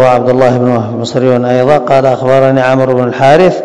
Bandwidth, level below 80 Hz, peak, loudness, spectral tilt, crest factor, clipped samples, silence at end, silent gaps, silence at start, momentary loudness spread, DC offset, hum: 11 kHz; -44 dBFS; 0 dBFS; -9 LUFS; -7 dB/octave; 8 dB; 5%; 0 s; none; 0 s; 5 LU; 2%; none